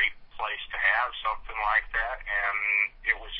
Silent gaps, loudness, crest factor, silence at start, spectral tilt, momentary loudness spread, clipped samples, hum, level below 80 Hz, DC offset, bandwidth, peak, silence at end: none; -27 LUFS; 20 dB; 0 s; -4 dB/octave; 8 LU; under 0.1%; none; -46 dBFS; under 0.1%; 5.8 kHz; -10 dBFS; 0 s